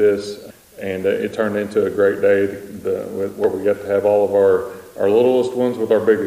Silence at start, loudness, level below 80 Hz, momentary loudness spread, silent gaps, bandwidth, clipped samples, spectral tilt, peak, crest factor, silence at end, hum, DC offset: 0 s; -18 LUFS; -58 dBFS; 11 LU; none; 15.5 kHz; under 0.1%; -6.5 dB/octave; -4 dBFS; 14 dB; 0 s; none; under 0.1%